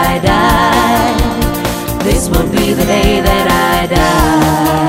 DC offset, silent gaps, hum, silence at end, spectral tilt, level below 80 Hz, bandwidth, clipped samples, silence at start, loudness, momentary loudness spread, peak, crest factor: under 0.1%; none; none; 0 s; -5 dB/octave; -20 dBFS; 16.5 kHz; under 0.1%; 0 s; -11 LUFS; 5 LU; 0 dBFS; 10 dB